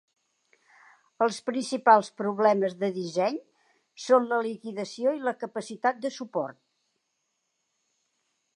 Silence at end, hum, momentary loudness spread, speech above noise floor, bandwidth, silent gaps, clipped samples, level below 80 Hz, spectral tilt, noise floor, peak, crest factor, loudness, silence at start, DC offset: 2.05 s; none; 14 LU; 52 dB; 11 kHz; none; under 0.1%; -84 dBFS; -5 dB/octave; -78 dBFS; -6 dBFS; 24 dB; -27 LUFS; 1.2 s; under 0.1%